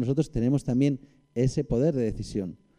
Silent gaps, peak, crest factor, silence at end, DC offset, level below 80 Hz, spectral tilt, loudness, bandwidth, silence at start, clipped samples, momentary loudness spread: none; -12 dBFS; 14 dB; 0.25 s; under 0.1%; -44 dBFS; -8 dB/octave; -27 LUFS; 10.5 kHz; 0 s; under 0.1%; 9 LU